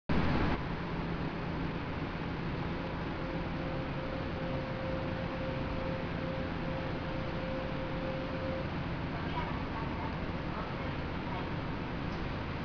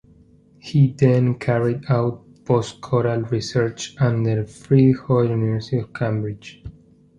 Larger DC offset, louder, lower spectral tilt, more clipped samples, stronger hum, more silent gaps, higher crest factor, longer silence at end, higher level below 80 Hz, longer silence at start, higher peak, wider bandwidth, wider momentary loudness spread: neither; second, -37 LUFS vs -20 LUFS; second, -5.5 dB/octave vs -7.5 dB/octave; neither; neither; neither; about the same, 18 dB vs 18 dB; second, 0 s vs 0.45 s; first, -44 dBFS vs -50 dBFS; second, 0.1 s vs 0.65 s; second, -18 dBFS vs -2 dBFS; second, 5.4 kHz vs 9.4 kHz; second, 1 LU vs 10 LU